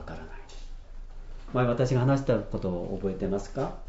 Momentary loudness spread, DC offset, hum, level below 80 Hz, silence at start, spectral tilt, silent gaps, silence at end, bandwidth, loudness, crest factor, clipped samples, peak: 24 LU; under 0.1%; none; -40 dBFS; 0 s; -8 dB/octave; none; 0 s; 8 kHz; -28 LUFS; 18 dB; under 0.1%; -12 dBFS